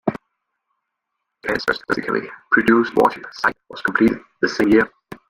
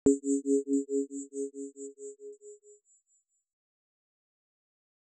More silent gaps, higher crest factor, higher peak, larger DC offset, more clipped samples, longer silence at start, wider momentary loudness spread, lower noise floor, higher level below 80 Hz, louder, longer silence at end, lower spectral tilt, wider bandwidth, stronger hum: neither; about the same, 20 dB vs 22 dB; first, -2 dBFS vs -12 dBFS; neither; neither; about the same, 0.05 s vs 0.05 s; second, 10 LU vs 20 LU; first, -78 dBFS vs -74 dBFS; first, -52 dBFS vs -68 dBFS; first, -19 LUFS vs -32 LUFS; second, 0.15 s vs 2.3 s; second, -5.5 dB/octave vs -7 dB/octave; first, 15.5 kHz vs 9.2 kHz; neither